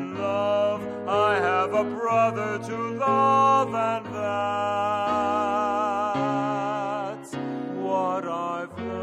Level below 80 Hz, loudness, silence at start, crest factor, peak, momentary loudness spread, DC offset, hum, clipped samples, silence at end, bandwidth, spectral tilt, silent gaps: -66 dBFS; -25 LUFS; 0 s; 16 dB; -10 dBFS; 10 LU; under 0.1%; none; under 0.1%; 0 s; 12 kHz; -6 dB/octave; none